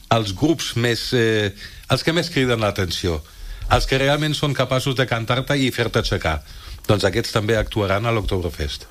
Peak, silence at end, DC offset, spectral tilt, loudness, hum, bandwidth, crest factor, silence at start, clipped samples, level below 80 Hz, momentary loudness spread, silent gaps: -2 dBFS; 0.05 s; under 0.1%; -5 dB/octave; -20 LUFS; none; 15.5 kHz; 18 dB; 0.1 s; under 0.1%; -34 dBFS; 8 LU; none